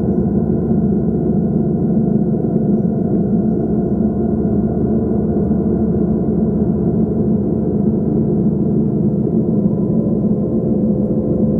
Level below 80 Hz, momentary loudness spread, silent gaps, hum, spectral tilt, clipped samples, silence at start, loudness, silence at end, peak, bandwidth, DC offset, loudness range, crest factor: -32 dBFS; 1 LU; none; none; -14 dB/octave; under 0.1%; 0 s; -16 LUFS; 0 s; -2 dBFS; 1.7 kHz; under 0.1%; 0 LU; 12 dB